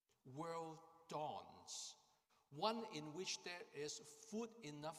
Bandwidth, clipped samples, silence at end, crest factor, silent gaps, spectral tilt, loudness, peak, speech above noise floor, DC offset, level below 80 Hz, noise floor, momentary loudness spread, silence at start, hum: 15.5 kHz; under 0.1%; 0 s; 24 dB; none; -3 dB/octave; -50 LUFS; -28 dBFS; 30 dB; under 0.1%; under -90 dBFS; -79 dBFS; 11 LU; 0.25 s; none